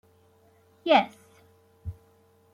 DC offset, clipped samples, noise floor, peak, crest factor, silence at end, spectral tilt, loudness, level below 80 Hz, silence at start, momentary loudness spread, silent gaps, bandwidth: under 0.1%; under 0.1%; -61 dBFS; -6 dBFS; 26 dB; 0.6 s; -5.5 dB/octave; -25 LUFS; -58 dBFS; 0.85 s; 21 LU; none; 14 kHz